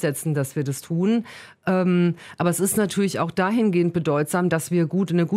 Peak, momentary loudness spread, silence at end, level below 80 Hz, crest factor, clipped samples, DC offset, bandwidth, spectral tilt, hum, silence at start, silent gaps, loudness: -8 dBFS; 5 LU; 0 s; -62 dBFS; 14 dB; under 0.1%; under 0.1%; 16 kHz; -6 dB/octave; none; 0 s; none; -22 LUFS